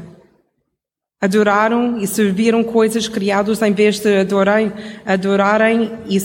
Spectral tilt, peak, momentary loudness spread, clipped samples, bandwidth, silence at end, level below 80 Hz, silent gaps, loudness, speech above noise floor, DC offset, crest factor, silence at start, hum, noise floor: -5 dB/octave; -2 dBFS; 5 LU; under 0.1%; 17 kHz; 0 s; -56 dBFS; none; -15 LUFS; 65 dB; under 0.1%; 14 dB; 0 s; none; -79 dBFS